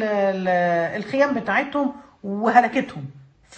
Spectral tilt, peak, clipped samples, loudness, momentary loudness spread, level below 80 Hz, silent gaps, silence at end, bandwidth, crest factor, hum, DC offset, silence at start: -6.5 dB/octave; -2 dBFS; under 0.1%; -21 LUFS; 15 LU; -62 dBFS; none; 0 s; 8.6 kHz; 20 dB; none; under 0.1%; 0 s